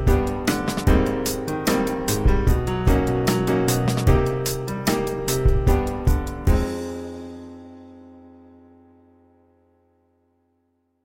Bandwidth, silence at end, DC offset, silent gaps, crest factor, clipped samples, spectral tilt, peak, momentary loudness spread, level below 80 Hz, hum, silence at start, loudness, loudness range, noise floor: 16.5 kHz; 2.75 s; under 0.1%; none; 18 dB; under 0.1%; -5.5 dB/octave; -4 dBFS; 12 LU; -26 dBFS; none; 0 s; -22 LUFS; 9 LU; -69 dBFS